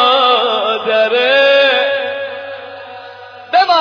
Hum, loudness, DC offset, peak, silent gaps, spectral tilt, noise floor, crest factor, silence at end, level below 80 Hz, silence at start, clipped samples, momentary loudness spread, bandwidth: none; -12 LUFS; under 0.1%; 0 dBFS; none; -2.5 dB/octave; -33 dBFS; 12 dB; 0 s; -62 dBFS; 0 s; under 0.1%; 21 LU; 5.4 kHz